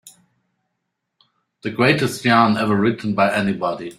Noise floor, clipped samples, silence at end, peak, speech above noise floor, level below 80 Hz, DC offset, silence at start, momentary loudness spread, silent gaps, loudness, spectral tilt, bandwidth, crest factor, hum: -77 dBFS; under 0.1%; 0.05 s; -2 dBFS; 59 dB; -58 dBFS; under 0.1%; 0.05 s; 8 LU; none; -18 LUFS; -5.5 dB/octave; 15 kHz; 18 dB; none